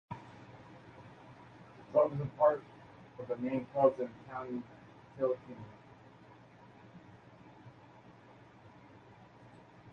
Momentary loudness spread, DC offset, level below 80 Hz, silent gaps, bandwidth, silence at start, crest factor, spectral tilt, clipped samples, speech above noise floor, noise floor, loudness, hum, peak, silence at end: 28 LU; under 0.1%; -72 dBFS; none; 6.8 kHz; 0.1 s; 24 dB; -9 dB/octave; under 0.1%; 25 dB; -58 dBFS; -34 LUFS; none; -14 dBFS; 0 s